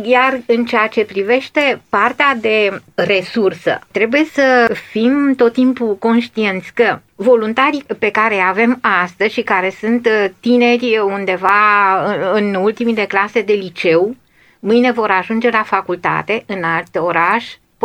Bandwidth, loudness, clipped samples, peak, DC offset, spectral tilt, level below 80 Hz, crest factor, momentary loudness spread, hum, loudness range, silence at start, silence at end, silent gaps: 9.8 kHz; -14 LUFS; under 0.1%; -2 dBFS; under 0.1%; -5.5 dB/octave; -60 dBFS; 14 dB; 6 LU; none; 2 LU; 0 s; 0.3 s; none